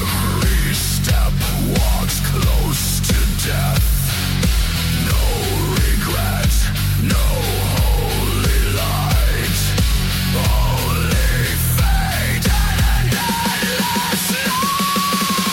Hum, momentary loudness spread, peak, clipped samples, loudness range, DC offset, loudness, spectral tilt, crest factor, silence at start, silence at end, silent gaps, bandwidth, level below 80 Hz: none; 2 LU; -6 dBFS; under 0.1%; 1 LU; under 0.1%; -17 LUFS; -4 dB/octave; 10 dB; 0 s; 0 s; none; 17 kHz; -20 dBFS